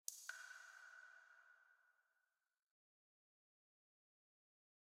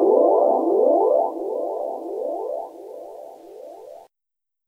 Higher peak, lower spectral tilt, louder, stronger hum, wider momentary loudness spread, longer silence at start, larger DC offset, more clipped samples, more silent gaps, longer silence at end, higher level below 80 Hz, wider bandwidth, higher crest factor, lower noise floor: second, -24 dBFS vs -6 dBFS; second, 6 dB/octave vs -7.5 dB/octave; second, -57 LUFS vs -21 LUFS; neither; second, 14 LU vs 23 LU; about the same, 0.1 s vs 0 s; neither; neither; neither; first, 2.95 s vs 0.7 s; second, under -90 dBFS vs -76 dBFS; first, 15.5 kHz vs 2.3 kHz; first, 40 dB vs 16 dB; about the same, under -90 dBFS vs -87 dBFS